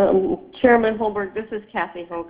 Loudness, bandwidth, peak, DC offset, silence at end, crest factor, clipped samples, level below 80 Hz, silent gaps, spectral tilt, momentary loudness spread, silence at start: -21 LUFS; 4 kHz; -2 dBFS; under 0.1%; 0 s; 18 dB; under 0.1%; -50 dBFS; none; -10 dB/octave; 12 LU; 0 s